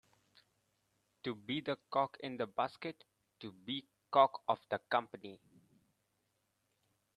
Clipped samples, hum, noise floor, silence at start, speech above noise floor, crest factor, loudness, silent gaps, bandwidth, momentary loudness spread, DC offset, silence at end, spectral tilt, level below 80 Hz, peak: under 0.1%; none; -82 dBFS; 1.25 s; 45 dB; 26 dB; -37 LUFS; none; 11 kHz; 20 LU; under 0.1%; 1.8 s; -6.5 dB/octave; -84 dBFS; -14 dBFS